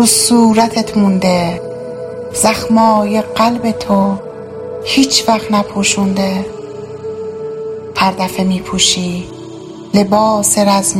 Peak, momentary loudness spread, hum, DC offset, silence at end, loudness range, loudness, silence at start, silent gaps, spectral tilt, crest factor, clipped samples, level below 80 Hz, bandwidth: 0 dBFS; 15 LU; none; under 0.1%; 0 s; 4 LU; -13 LUFS; 0 s; none; -4 dB/octave; 14 dB; under 0.1%; -44 dBFS; 16.5 kHz